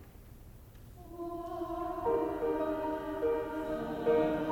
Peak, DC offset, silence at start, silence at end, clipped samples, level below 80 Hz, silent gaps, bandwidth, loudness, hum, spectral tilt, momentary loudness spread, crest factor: -18 dBFS; under 0.1%; 0 s; 0 s; under 0.1%; -54 dBFS; none; 18.5 kHz; -34 LUFS; none; -7.5 dB/octave; 24 LU; 16 dB